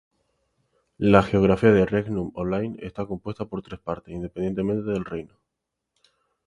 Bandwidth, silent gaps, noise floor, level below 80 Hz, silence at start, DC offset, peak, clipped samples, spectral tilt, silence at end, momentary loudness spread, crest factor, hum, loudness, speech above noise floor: 10.5 kHz; none; -83 dBFS; -48 dBFS; 1 s; under 0.1%; 0 dBFS; under 0.1%; -8.5 dB/octave; 1.2 s; 15 LU; 24 dB; none; -24 LUFS; 59 dB